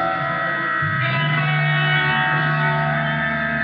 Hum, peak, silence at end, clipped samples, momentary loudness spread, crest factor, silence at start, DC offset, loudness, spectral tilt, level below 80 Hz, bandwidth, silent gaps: none; -8 dBFS; 0 s; under 0.1%; 4 LU; 12 dB; 0 s; under 0.1%; -19 LUFS; -9 dB/octave; -50 dBFS; 5.2 kHz; none